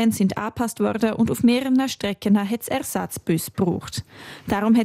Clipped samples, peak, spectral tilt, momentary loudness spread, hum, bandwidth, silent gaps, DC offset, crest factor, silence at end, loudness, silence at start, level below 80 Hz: under 0.1%; -6 dBFS; -5.5 dB/octave; 9 LU; none; 16 kHz; none; under 0.1%; 14 dB; 0 s; -22 LUFS; 0 s; -54 dBFS